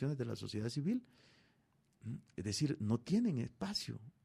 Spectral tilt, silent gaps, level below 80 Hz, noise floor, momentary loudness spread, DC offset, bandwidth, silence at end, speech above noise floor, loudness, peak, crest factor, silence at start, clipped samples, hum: -6 dB/octave; none; -70 dBFS; -75 dBFS; 12 LU; under 0.1%; 14.5 kHz; 0.15 s; 36 dB; -39 LUFS; -24 dBFS; 16 dB; 0 s; under 0.1%; none